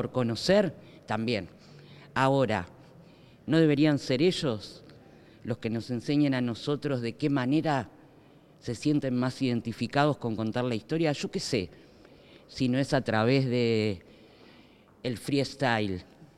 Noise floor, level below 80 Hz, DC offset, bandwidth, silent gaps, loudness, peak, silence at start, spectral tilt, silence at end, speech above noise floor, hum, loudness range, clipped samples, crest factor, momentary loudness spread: -56 dBFS; -62 dBFS; under 0.1%; 13.5 kHz; none; -28 LUFS; -10 dBFS; 0 s; -6.5 dB/octave; 0.1 s; 29 dB; none; 3 LU; under 0.1%; 20 dB; 13 LU